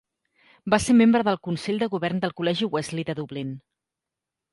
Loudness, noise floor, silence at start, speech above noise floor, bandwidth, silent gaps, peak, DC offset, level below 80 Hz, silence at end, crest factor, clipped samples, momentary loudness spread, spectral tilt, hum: -24 LUFS; -87 dBFS; 0.65 s; 64 dB; 11.5 kHz; none; -6 dBFS; under 0.1%; -54 dBFS; 0.95 s; 18 dB; under 0.1%; 16 LU; -5.5 dB/octave; none